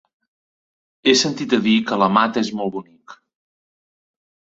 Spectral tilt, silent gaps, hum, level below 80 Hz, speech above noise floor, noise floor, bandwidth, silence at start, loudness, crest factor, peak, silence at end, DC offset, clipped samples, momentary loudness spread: -4 dB/octave; none; none; -64 dBFS; over 72 dB; under -90 dBFS; 8 kHz; 1.05 s; -18 LUFS; 20 dB; -2 dBFS; 1.45 s; under 0.1%; under 0.1%; 10 LU